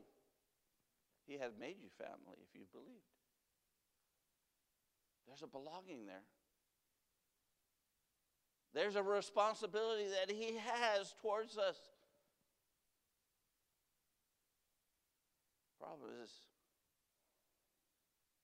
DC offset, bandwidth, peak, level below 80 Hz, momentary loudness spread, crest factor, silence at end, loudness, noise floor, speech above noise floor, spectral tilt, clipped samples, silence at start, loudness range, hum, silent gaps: under 0.1%; 15.5 kHz; -24 dBFS; under -90 dBFS; 22 LU; 24 dB; 2.05 s; -42 LUFS; -87 dBFS; 43 dB; -3 dB/octave; under 0.1%; 0 s; 21 LU; none; none